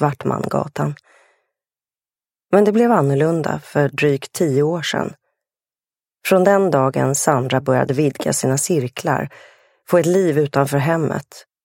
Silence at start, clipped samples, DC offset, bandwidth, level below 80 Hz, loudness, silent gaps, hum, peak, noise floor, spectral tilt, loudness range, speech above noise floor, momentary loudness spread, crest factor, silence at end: 0 s; under 0.1%; under 0.1%; 16.5 kHz; -60 dBFS; -18 LUFS; none; none; 0 dBFS; under -90 dBFS; -5.5 dB/octave; 2 LU; over 73 dB; 9 LU; 18 dB; 0.25 s